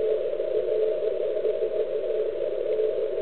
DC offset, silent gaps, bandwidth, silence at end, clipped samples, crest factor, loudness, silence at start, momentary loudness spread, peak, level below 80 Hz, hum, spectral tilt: 1%; none; 4.3 kHz; 0 s; under 0.1%; 12 dB; -27 LUFS; 0 s; 2 LU; -14 dBFS; -64 dBFS; none; -9 dB/octave